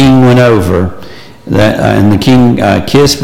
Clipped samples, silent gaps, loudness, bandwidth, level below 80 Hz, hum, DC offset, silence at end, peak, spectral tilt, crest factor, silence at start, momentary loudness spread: under 0.1%; none; -7 LUFS; 16.5 kHz; -30 dBFS; none; under 0.1%; 0 s; 0 dBFS; -6 dB/octave; 6 dB; 0 s; 8 LU